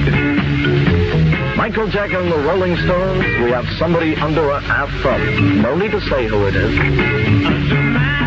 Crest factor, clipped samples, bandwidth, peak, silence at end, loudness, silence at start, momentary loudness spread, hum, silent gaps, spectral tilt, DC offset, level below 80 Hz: 12 dB; under 0.1%; 7.4 kHz; -2 dBFS; 0 s; -16 LUFS; 0 s; 3 LU; none; none; -8 dB/octave; under 0.1%; -28 dBFS